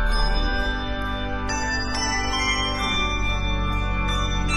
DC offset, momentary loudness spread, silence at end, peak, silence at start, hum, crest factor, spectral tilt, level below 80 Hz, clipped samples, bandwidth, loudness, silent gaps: under 0.1%; 5 LU; 0 s; -10 dBFS; 0 s; none; 14 dB; -3.5 dB/octave; -26 dBFS; under 0.1%; 11 kHz; -24 LUFS; none